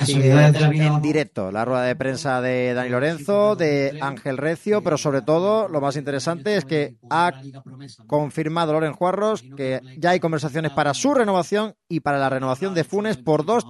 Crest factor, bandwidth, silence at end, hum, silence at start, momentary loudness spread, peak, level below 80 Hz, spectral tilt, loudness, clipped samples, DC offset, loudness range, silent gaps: 18 dB; 12 kHz; 0 s; none; 0 s; 7 LU; -4 dBFS; -62 dBFS; -6 dB/octave; -21 LUFS; under 0.1%; under 0.1%; 3 LU; none